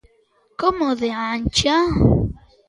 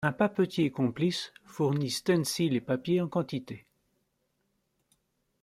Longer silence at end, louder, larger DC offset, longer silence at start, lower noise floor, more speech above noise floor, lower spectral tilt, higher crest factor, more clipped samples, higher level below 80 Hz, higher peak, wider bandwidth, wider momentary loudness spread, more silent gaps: second, 0.3 s vs 1.85 s; first, -19 LUFS vs -29 LUFS; neither; first, 0.6 s vs 0 s; second, -60 dBFS vs -77 dBFS; second, 42 dB vs 48 dB; about the same, -5.5 dB/octave vs -5.5 dB/octave; about the same, 18 dB vs 20 dB; neither; first, -32 dBFS vs -68 dBFS; first, -2 dBFS vs -12 dBFS; second, 11.5 kHz vs 15.5 kHz; second, 7 LU vs 10 LU; neither